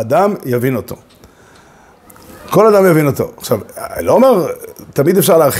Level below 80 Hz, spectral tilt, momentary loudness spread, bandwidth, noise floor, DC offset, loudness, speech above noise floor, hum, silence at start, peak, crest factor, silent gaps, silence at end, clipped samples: -48 dBFS; -6 dB/octave; 13 LU; 16.5 kHz; -44 dBFS; under 0.1%; -13 LUFS; 32 dB; none; 0 s; 0 dBFS; 14 dB; none; 0 s; under 0.1%